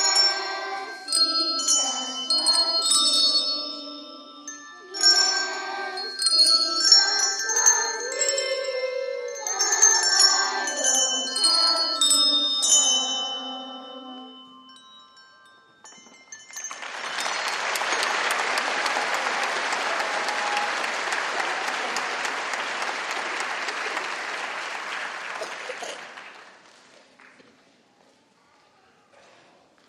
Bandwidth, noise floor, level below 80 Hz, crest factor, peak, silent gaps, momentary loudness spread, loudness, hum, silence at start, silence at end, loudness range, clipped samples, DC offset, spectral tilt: 15 kHz; -60 dBFS; -88 dBFS; 24 dB; 0 dBFS; none; 18 LU; -21 LUFS; none; 0 s; 3.35 s; 16 LU; under 0.1%; under 0.1%; 2.5 dB/octave